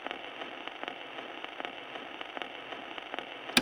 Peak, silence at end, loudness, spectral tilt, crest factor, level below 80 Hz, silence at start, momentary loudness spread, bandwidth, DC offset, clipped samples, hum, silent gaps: -8 dBFS; 0 s; -39 LUFS; -2 dB/octave; 32 dB; -76 dBFS; 0 s; 2 LU; 19.5 kHz; under 0.1%; under 0.1%; none; none